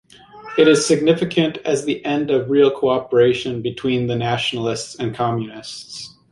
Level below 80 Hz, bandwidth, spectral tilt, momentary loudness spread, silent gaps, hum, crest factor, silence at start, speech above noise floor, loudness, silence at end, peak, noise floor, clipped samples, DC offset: -56 dBFS; 11.5 kHz; -5 dB/octave; 13 LU; none; none; 16 dB; 0.35 s; 21 dB; -18 LUFS; 0.25 s; -2 dBFS; -39 dBFS; under 0.1%; under 0.1%